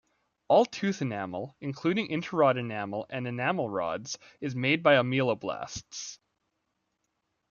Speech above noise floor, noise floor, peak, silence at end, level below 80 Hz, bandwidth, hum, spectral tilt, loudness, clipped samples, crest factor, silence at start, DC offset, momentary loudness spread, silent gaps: 51 dB; -80 dBFS; -8 dBFS; 1.35 s; -68 dBFS; 7.2 kHz; none; -5 dB/octave; -29 LUFS; under 0.1%; 22 dB; 0.5 s; under 0.1%; 14 LU; none